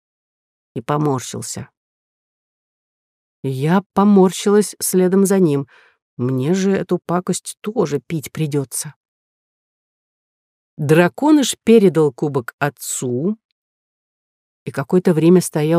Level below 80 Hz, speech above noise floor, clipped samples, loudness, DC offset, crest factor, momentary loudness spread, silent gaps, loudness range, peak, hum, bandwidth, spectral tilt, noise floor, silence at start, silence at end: -64 dBFS; over 74 dB; under 0.1%; -17 LUFS; under 0.1%; 16 dB; 14 LU; 1.77-3.43 s, 3.86-3.90 s, 6.02-6.17 s, 8.96-10.77 s, 12.53-12.58 s, 13.45-14.66 s; 9 LU; -2 dBFS; none; 15.5 kHz; -6 dB/octave; under -90 dBFS; 0.75 s; 0 s